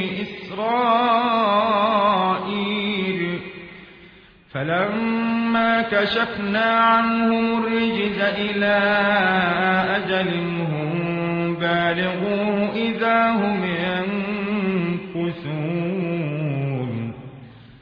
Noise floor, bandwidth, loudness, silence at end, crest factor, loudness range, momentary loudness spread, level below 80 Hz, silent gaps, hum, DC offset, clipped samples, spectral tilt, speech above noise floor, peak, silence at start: -48 dBFS; 5.4 kHz; -21 LUFS; 0.05 s; 16 dB; 5 LU; 9 LU; -56 dBFS; none; none; under 0.1%; under 0.1%; -8.5 dB/octave; 28 dB; -4 dBFS; 0 s